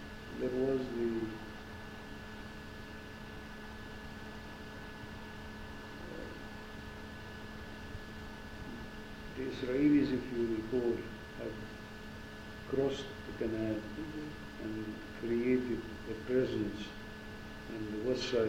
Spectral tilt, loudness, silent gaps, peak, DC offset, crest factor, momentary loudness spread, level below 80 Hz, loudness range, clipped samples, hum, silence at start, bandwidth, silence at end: -6.5 dB/octave; -39 LUFS; none; -20 dBFS; under 0.1%; 18 dB; 14 LU; -54 dBFS; 12 LU; under 0.1%; none; 0 s; 16 kHz; 0 s